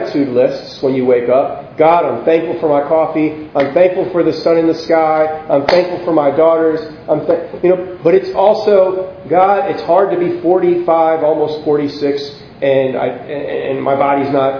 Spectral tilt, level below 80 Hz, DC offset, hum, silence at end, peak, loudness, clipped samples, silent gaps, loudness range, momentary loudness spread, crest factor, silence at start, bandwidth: -7.5 dB/octave; -52 dBFS; under 0.1%; none; 0 s; 0 dBFS; -13 LUFS; under 0.1%; none; 2 LU; 7 LU; 12 dB; 0 s; 5.4 kHz